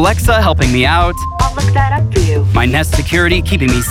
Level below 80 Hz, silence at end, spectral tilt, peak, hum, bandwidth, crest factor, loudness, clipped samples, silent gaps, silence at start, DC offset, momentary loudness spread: -20 dBFS; 0 s; -5 dB/octave; -2 dBFS; none; 16.5 kHz; 10 dB; -12 LUFS; under 0.1%; none; 0 s; under 0.1%; 3 LU